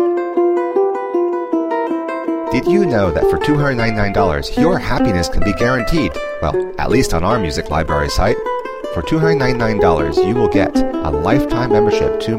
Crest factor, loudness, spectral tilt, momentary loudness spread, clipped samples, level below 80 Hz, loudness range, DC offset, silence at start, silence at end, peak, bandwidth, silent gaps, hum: 14 dB; -16 LUFS; -6.5 dB/octave; 5 LU; under 0.1%; -28 dBFS; 2 LU; 0.9%; 0 s; 0 s; 0 dBFS; 16 kHz; none; none